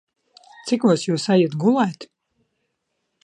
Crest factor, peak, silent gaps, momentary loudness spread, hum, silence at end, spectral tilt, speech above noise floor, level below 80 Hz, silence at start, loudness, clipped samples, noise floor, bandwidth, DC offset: 18 dB; -4 dBFS; none; 11 LU; none; 1.2 s; -6 dB/octave; 56 dB; -72 dBFS; 0.65 s; -20 LUFS; under 0.1%; -75 dBFS; 11 kHz; under 0.1%